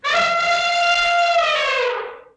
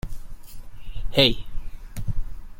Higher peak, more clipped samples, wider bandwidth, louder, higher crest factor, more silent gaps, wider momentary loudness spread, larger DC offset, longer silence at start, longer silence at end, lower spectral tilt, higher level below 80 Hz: second, -8 dBFS vs -2 dBFS; neither; second, 9.6 kHz vs 16.5 kHz; first, -17 LUFS vs -23 LUFS; second, 10 dB vs 22 dB; neither; second, 5 LU vs 26 LU; neither; about the same, 0 s vs 0.05 s; first, 0.15 s vs 0 s; second, 0 dB/octave vs -5 dB/octave; second, -54 dBFS vs -32 dBFS